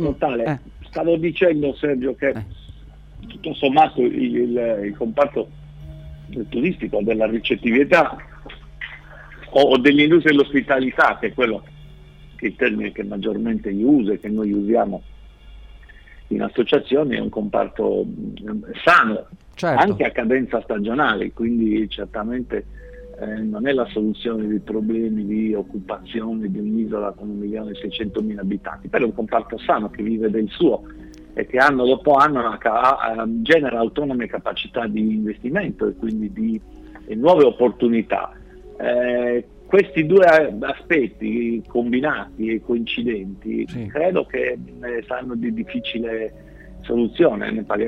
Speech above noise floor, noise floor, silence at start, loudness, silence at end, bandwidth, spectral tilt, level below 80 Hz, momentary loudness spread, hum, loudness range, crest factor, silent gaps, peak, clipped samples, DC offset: 23 dB; -43 dBFS; 0 s; -20 LUFS; 0 s; 9.4 kHz; -7 dB/octave; -46 dBFS; 14 LU; none; 7 LU; 18 dB; none; -2 dBFS; under 0.1%; under 0.1%